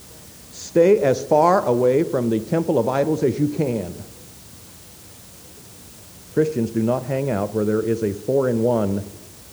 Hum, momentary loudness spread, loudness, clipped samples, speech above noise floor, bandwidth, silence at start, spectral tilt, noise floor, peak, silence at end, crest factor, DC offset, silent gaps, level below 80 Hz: none; 24 LU; -20 LUFS; under 0.1%; 24 dB; over 20 kHz; 0 s; -7 dB/octave; -43 dBFS; -4 dBFS; 0 s; 18 dB; under 0.1%; none; -54 dBFS